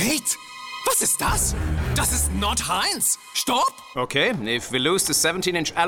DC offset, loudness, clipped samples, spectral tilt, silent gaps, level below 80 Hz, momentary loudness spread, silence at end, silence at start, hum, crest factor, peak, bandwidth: under 0.1%; -21 LUFS; under 0.1%; -2.5 dB/octave; none; -34 dBFS; 6 LU; 0 s; 0 s; none; 18 dB; -6 dBFS; 19 kHz